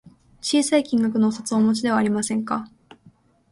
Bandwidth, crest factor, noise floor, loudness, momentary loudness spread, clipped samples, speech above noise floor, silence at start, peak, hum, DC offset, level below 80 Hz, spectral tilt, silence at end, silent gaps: 11.5 kHz; 18 dB; -55 dBFS; -22 LUFS; 8 LU; under 0.1%; 35 dB; 0.05 s; -4 dBFS; none; under 0.1%; -62 dBFS; -4.5 dB/octave; 0.85 s; none